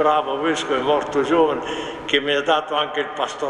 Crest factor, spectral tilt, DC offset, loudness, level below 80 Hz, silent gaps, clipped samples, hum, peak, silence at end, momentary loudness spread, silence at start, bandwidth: 16 dB; -3.5 dB/octave; under 0.1%; -20 LUFS; -54 dBFS; none; under 0.1%; none; -4 dBFS; 0 s; 7 LU; 0 s; 11 kHz